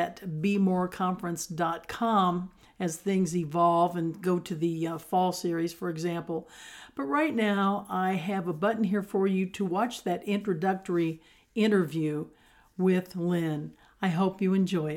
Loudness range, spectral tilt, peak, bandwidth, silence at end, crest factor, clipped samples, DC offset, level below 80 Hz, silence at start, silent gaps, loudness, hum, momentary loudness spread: 2 LU; -6.5 dB/octave; -14 dBFS; 16 kHz; 0 s; 16 dB; under 0.1%; under 0.1%; -66 dBFS; 0 s; none; -29 LUFS; none; 10 LU